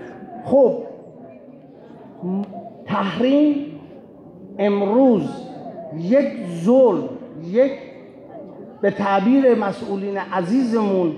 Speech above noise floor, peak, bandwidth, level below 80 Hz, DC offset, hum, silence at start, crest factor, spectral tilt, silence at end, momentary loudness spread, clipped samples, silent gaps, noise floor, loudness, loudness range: 25 dB; -6 dBFS; 10 kHz; -66 dBFS; under 0.1%; none; 0 s; 14 dB; -8 dB/octave; 0 s; 21 LU; under 0.1%; none; -42 dBFS; -19 LUFS; 4 LU